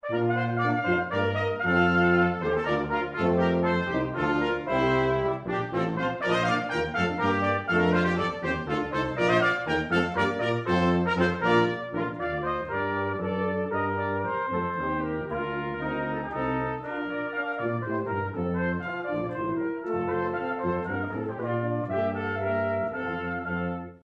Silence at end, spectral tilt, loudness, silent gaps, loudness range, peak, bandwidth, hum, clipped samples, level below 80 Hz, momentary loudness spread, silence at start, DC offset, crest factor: 0.05 s; -7 dB/octave; -27 LUFS; none; 5 LU; -10 dBFS; 9 kHz; none; under 0.1%; -52 dBFS; 7 LU; 0.05 s; under 0.1%; 18 dB